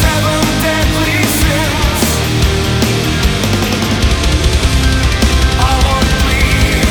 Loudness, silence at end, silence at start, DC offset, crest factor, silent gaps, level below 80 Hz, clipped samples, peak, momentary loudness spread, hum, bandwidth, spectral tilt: -12 LUFS; 0 s; 0 s; under 0.1%; 12 dB; none; -16 dBFS; under 0.1%; 0 dBFS; 2 LU; none; over 20 kHz; -4.5 dB/octave